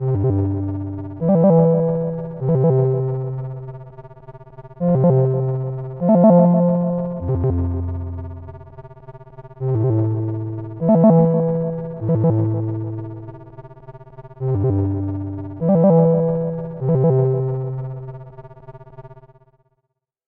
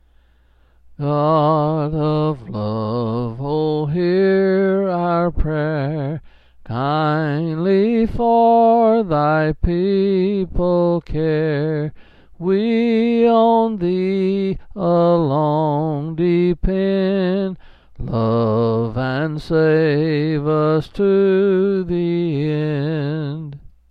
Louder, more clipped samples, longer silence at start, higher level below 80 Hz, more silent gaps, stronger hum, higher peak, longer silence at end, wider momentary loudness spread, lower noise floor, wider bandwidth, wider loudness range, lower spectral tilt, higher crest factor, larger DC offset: about the same, -18 LUFS vs -18 LUFS; neither; second, 0 s vs 0.9 s; second, -44 dBFS vs -36 dBFS; neither; neither; about the same, -2 dBFS vs -4 dBFS; first, 1.1 s vs 0.25 s; first, 18 LU vs 8 LU; first, -75 dBFS vs -54 dBFS; second, 2.5 kHz vs 5.4 kHz; first, 7 LU vs 3 LU; first, -14.5 dB/octave vs -10 dB/octave; about the same, 18 dB vs 14 dB; neither